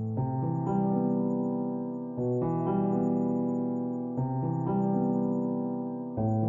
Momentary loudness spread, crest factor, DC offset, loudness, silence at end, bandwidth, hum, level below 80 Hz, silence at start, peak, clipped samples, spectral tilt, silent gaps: 5 LU; 14 dB; under 0.1%; -30 LUFS; 0 s; 6.8 kHz; none; -60 dBFS; 0 s; -16 dBFS; under 0.1%; -12.5 dB/octave; none